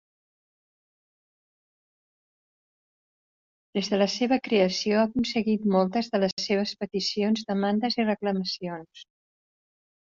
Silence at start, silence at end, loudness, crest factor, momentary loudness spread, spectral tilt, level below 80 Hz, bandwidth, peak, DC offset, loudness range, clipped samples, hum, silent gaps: 3.75 s; 1.1 s; -26 LUFS; 20 dB; 7 LU; -4 dB/octave; -66 dBFS; 7.6 kHz; -10 dBFS; under 0.1%; 6 LU; under 0.1%; none; 6.33-6.37 s